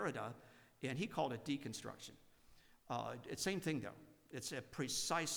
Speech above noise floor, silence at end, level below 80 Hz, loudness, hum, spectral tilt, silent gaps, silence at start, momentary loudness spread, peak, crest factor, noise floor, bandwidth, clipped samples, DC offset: 23 dB; 0 s; -74 dBFS; -44 LUFS; none; -3.5 dB/octave; none; 0 s; 14 LU; -26 dBFS; 20 dB; -67 dBFS; over 20 kHz; under 0.1%; under 0.1%